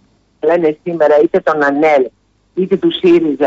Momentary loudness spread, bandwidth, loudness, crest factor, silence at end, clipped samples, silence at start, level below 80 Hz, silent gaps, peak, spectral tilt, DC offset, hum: 9 LU; 7.6 kHz; -13 LUFS; 10 dB; 0 s; under 0.1%; 0.45 s; -56 dBFS; none; -2 dBFS; -7 dB/octave; under 0.1%; none